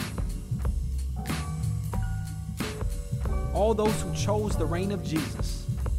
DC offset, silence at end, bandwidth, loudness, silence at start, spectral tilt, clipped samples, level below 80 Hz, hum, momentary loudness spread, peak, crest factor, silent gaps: under 0.1%; 0 s; 16 kHz; -30 LUFS; 0 s; -6 dB/octave; under 0.1%; -34 dBFS; none; 7 LU; -12 dBFS; 16 dB; none